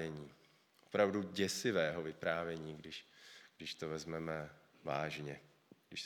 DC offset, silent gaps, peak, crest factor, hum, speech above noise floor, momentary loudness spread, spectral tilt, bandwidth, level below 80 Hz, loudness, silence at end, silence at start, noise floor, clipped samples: under 0.1%; none; -18 dBFS; 24 dB; none; 30 dB; 18 LU; -4.5 dB/octave; 19.5 kHz; -74 dBFS; -40 LUFS; 0 s; 0 s; -69 dBFS; under 0.1%